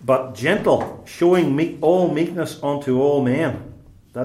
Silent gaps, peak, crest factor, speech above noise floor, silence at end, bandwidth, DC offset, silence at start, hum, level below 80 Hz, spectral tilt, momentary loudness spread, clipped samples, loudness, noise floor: none; -4 dBFS; 16 dB; 20 dB; 0 s; 14.5 kHz; under 0.1%; 0 s; none; -54 dBFS; -7 dB/octave; 8 LU; under 0.1%; -19 LUFS; -39 dBFS